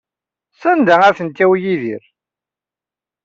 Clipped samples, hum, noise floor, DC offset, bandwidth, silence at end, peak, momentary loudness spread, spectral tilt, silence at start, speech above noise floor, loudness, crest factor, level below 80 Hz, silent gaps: under 0.1%; 60 Hz at -50 dBFS; -89 dBFS; under 0.1%; 7.4 kHz; 1.25 s; -2 dBFS; 12 LU; -6.5 dB/octave; 0.6 s; 76 dB; -14 LUFS; 16 dB; -62 dBFS; none